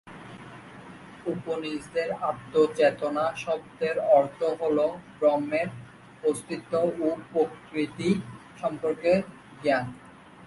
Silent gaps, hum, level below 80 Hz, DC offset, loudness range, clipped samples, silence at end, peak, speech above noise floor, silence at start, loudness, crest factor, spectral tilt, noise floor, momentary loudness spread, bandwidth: none; none; -64 dBFS; under 0.1%; 4 LU; under 0.1%; 0 s; -8 dBFS; 19 dB; 0.05 s; -27 LUFS; 20 dB; -6 dB/octave; -46 dBFS; 21 LU; 11.5 kHz